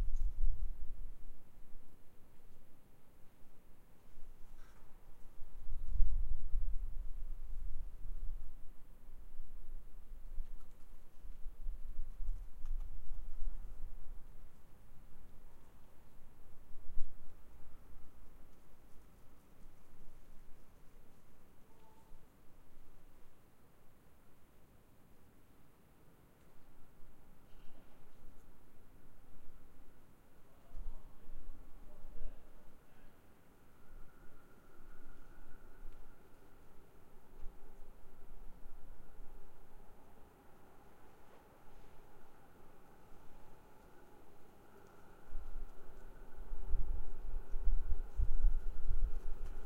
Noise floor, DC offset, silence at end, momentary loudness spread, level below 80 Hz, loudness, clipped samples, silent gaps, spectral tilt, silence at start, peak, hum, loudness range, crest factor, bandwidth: -61 dBFS; under 0.1%; 0 s; 22 LU; -42 dBFS; -50 LUFS; under 0.1%; none; -7 dB/octave; 0 s; -14 dBFS; none; 19 LU; 22 dB; 1.7 kHz